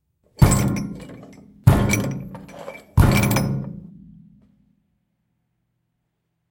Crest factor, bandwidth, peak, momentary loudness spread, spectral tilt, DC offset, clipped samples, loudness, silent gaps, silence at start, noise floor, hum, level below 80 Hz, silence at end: 22 dB; 17 kHz; 0 dBFS; 21 LU; -6 dB/octave; under 0.1%; under 0.1%; -20 LUFS; none; 0.4 s; -74 dBFS; none; -32 dBFS; 2.7 s